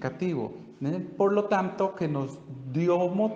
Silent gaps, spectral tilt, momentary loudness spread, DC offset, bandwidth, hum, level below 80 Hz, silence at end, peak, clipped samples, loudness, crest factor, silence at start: none; -8 dB/octave; 10 LU; under 0.1%; 8 kHz; none; -68 dBFS; 0 s; -12 dBFS; under 0.1%; -28 LUFS; 16 dB; 0 s